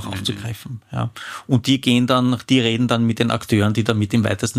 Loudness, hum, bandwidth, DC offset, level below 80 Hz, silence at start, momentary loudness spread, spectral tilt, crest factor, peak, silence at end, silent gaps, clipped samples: -19 LUFS; none; 15.5 kHz; under 0.1%; -52 dBFS; 0 s; 12 LU; -5.5 dB/octave; 16 dB; -2 dBFS; 0 s; none; under 0.1%